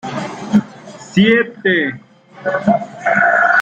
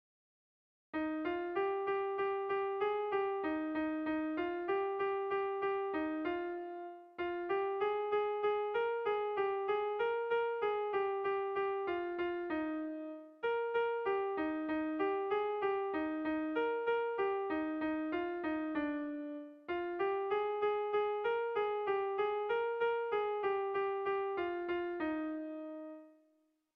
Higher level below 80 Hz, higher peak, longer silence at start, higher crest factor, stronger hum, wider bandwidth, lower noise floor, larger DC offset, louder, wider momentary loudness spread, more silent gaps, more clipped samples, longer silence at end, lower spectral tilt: first, -54 dBFS vs -72 dBFS; first, -2 dBFS vs -24 dBFS; second, 0.05 s vs 0.95 s; about the same, 14 dB vs 12 dB; neither; first, 8.6 kHz vs 5 kHz; second, -35 dBFS vs -75 dBFS; neither; first, -15 LUFS vs -36 LUFS; first, 13 LU vs 6 LU; neither; neither; second, 0 s vs 0.65 s; about the same, -6 dB/octave vs -7 dB/octave